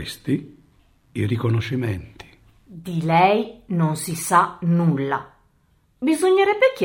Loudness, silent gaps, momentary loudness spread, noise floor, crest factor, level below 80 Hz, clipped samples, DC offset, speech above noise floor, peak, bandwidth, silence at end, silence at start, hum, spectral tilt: -21 LUFS; none; 11 LU; -61 dBFS; 18 dB; -56 dBFS; under 0.1%; under 0.1%; 41 dB; -2 dBFS; 16.5 kHz; 0 s; 0 s; none; -6 dB/octave